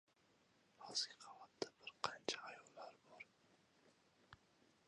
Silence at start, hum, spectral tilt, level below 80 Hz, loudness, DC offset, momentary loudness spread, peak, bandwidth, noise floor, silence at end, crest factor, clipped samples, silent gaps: 0.8 s; none; -1 dB/octave; -88 dBFS; -48 LUFS; under 0.1%; 23 LU; -22 dBFS; 11 kHz; -77 dBFS; 0.5 s; 32 dB; under 0.1%; none